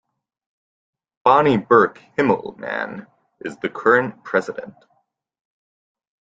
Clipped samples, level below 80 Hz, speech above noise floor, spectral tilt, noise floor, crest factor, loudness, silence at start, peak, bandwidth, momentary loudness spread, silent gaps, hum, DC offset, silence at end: under 0.1%; -60 dBFS; 49 dB; -7 dB/octave; -68 dBFS; 20 dB; -19 LUFS; 1.25 s; -2 dBFS; 7.8 kHz; 18 LU; none; none; under 0.1%; 1.7 s